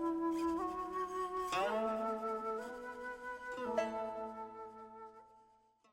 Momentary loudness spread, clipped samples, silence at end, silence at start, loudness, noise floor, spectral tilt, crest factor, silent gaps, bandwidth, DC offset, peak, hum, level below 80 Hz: 15 LU; under 0.1%; 0.5 s; 0 s; -40 LUFS; -69 dBFS; -4.5 dB/octave; 18 dB; none; 16 kHz; under 0.1%; -22 dBFS; none; -68 dBFS